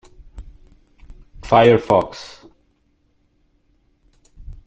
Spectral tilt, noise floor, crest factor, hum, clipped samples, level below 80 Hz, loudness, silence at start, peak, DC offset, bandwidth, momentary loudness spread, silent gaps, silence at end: -6.5 dB/octave; -62 dBFS; 20 dB; none; under 0.1%; -44 dBFS; -15 LUFS; 0.35 s; -2 dBFS; under 0.1%; 8.4 kHz; 26 LU; none; 0.15 s